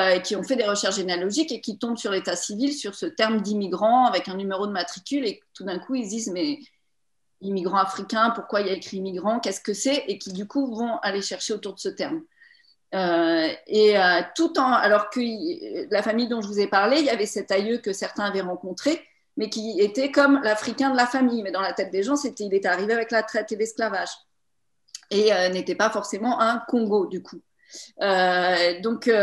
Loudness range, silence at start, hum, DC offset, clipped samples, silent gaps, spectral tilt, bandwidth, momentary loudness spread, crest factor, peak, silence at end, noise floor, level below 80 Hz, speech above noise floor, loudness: 5 LU; 0 s; none; under 0.1%; under 0.1%; none; -3.5 dB/octave; 12.5 kHz; 11 LU; 20 dB; -4 dBFS; 0 s; -81 dBFS; -74 dBFS; 57 dB; -24 LUFS